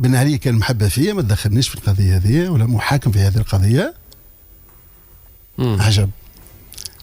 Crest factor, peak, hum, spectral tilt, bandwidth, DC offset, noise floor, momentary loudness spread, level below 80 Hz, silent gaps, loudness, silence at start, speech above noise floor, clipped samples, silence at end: 12 dB; -6 dBFS; none; -6 dB/octave; 16 kHz; under 0.1%; -45 dBFS; 8 LU; -36 dBFS; none; -17 LUFS; 0 s; 30 dB; under 0.1%; 0.15 s